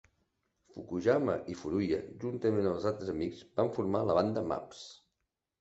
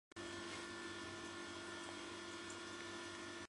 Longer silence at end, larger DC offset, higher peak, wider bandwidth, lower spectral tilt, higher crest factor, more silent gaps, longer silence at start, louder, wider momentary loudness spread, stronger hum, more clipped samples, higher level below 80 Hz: first, 0.65 s vs 0 s; neither; first, -14 dBFS vs -36 dBFS; second, 8.2 kHz vs 11.5 kHz; first, -7 dB/octave vs -2.5 dB/octave; about the same, 20 dB vs 16 dB; neither; first, 0.75 s vs 0.15 s; first, -33 LUFS vs -49 LUFS; first, 15 LU vs 1 LU; neither; neither; first, -60 dBFS vs -74 dBFS